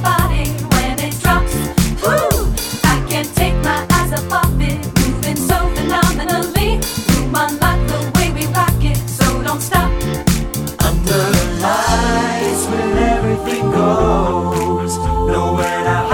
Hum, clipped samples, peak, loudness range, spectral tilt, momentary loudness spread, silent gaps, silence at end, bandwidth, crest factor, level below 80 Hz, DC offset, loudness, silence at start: none; under 0.1%; 0 dBFS; 1 LU; -5 dB/octave; 3 LU; none; 0 s; 19.5 kHz; 14 dB; -22 dBFS; under 0.1%; -16 LUFS; 0 s